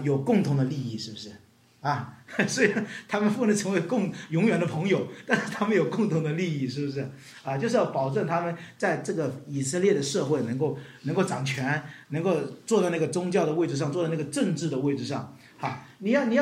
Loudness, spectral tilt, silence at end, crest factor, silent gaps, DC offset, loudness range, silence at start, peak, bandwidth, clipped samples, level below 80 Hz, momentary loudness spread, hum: -27 LUFS; -5.5 dB/octave; 0 s; 20 dB; none; under 0.1%; 2 LU; 0 s; -6 dBFS; 15 kHz; under 0.1%; -72 dBFS; 10 LU; none